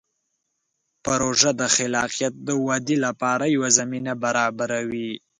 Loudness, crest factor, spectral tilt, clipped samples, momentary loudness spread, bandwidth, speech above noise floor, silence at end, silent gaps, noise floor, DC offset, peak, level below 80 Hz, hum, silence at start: -22 LUFS; 22 dB; -2.5 dB/octave; under 0.1%; 8 LU; 11 kHz; 54 dB; 0.25 s; none; -76 dBFS; under 0.1%; 0 dBFS; -60 dBFS; none; 1.05 s